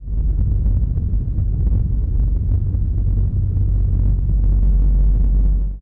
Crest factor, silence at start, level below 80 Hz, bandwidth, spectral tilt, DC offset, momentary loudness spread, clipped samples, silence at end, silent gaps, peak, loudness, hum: 6 dB; 0 s; -16 dBFS; 1.2 kHz; -13 dB/octave; under 0.1%; 3 LU; under 0.1%; 0 s; none; -8 dBFS; -20 LUFS; none